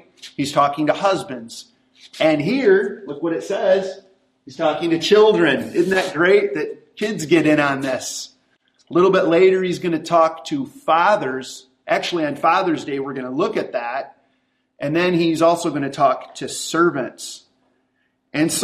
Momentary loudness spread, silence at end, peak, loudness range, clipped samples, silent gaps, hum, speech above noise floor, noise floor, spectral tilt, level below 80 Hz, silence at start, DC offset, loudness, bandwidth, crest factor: 14 LU; 0 s; -2 dBFS; 4 LU; under 0.1%; none; none; 49 dB; -67 dBFS; -4.5 dB/octave; -64 dBFS; 0.25 s; under 0.1%; -19 LUFS; 15 kHz; 18 dB